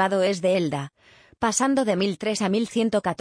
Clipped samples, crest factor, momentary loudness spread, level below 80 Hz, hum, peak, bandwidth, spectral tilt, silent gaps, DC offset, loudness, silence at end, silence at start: under 0.1%; 14 dB; 6 LU; -60 dBFS; none; -8 dBFS; 10.5 kHz; -4.5 dB/octave; none; under 0.1%; -23 LUFS; 0.05 s; 0 s